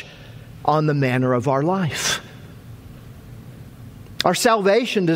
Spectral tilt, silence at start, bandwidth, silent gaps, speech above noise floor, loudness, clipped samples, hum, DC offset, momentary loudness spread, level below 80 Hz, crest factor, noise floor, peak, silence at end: -5 dB/octave; 0 s; 16 kHz; none; 22 dB; -19 LUFS; under 0.1%; none; under 0.1%; 24 LU; -52 dBFS; 22 dB; -40 dBFS; 0 dBFS; 0 s